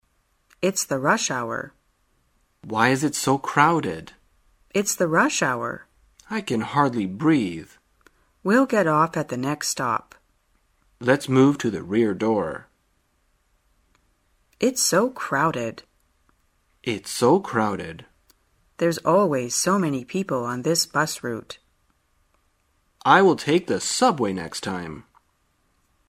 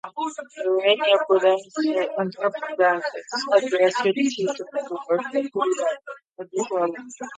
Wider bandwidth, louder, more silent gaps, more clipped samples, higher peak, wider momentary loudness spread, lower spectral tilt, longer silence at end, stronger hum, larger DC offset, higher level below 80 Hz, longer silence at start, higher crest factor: first, 16 kHz vs 9.4 kHz; about the same, -22 LUFS vs -23 LUFS; second, none vs 6.31-6.36 s; neither; about the same, -2 dBFS vs -4 dBFS; about the same, 13 LU vs 11 LU; about the same, -4 dB/octave vs -3.5 dB/octave; first, 1.05 s vs 0 s; neither; neither; first, -62 dBFS vs -78 dBFS; first, 0.6 s vs 0.05 s; about the same, 22 dB vs 18 dB